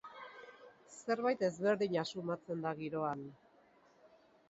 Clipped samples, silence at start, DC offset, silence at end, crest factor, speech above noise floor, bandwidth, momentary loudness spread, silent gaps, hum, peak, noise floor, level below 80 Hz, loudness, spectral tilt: under 0.1%; 0.05 s; under 0.1%; 0.4 s; 18 dB; 31 dB; 7.6 kHz; 20 LU; none; none; -20 dBFS; -67 dBFS; -80 dBFS; -37 LUFS; -4.5 dB/octave